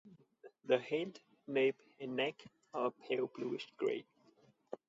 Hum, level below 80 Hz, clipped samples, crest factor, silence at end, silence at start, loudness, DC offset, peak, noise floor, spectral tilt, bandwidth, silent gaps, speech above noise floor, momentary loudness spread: none; -88 dBFS; under 0.1%; 20 dB; 0.15 s; 0.05 s; -39 LUFS; under 0.1%; -20 dBFS; -70 dBFS; -3 dB/octave; 7.6 kHz; none; 32 dB; 15 LU